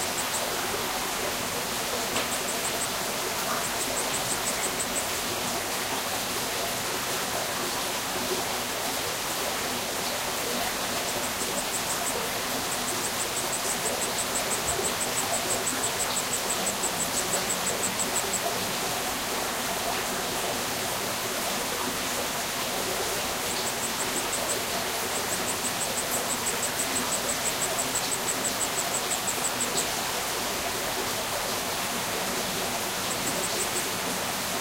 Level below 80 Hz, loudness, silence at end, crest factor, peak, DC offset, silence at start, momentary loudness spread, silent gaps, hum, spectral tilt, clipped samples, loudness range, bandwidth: -54 dBFS; -27 LUFS; 0 s; 16 dB; -12 dBFS; under 0.1%; 0 s; 2 LU; none; none; -1 dB/octave; under 0.1%; 2 LU; 16 kHz